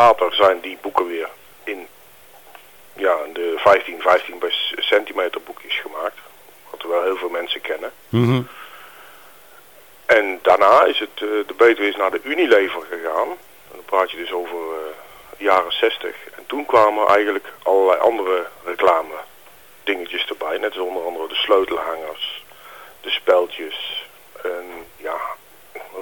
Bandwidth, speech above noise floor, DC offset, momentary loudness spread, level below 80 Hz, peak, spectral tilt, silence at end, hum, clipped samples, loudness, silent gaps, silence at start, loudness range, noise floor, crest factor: 19 kHz; 28 dB; 0.3%; 18 LU; -60 dBFS; -4 dBFS; -5 dB/octave; 0 s; none; under 0.1%; -19 LUFS; none; 0 s; 7 LU; -47 dBFS; 18 dB